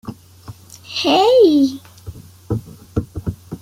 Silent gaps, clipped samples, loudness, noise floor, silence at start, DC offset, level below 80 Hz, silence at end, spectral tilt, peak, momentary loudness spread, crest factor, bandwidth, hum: none; under 0.1%; -16 LUFS; -39 dBFS; 0.05 s; under 0.1%; -42 dBFS; 0.05 s; -6 dB/octave; -2 dBFS; 26 LU; 16 dB; 16 kHz; none